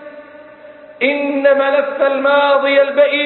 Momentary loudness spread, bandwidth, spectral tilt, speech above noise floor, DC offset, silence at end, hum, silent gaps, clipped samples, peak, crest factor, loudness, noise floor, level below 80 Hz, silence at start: 4 LU; 4.3 kHz; -7.5 dB/octave; 25 dB; under 0.1%; 0 s; none; none; under 0.1%; 0 dBFS; 14 dB; -13 LUFS; -38 dBFS; -66 dBFS; 0 s